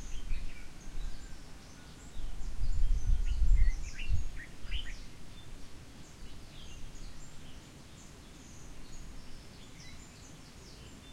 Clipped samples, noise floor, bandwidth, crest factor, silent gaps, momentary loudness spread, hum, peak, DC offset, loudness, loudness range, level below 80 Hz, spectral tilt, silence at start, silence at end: under 0.1%; -51 dBFS; 10 kHz; 18 dB; none; 17 LU; none; -14 dBFS; under 0.1%; -43 LUFS; 14 LU; -36 dBFS; -4.5 dB/octave; 0 s; 0 s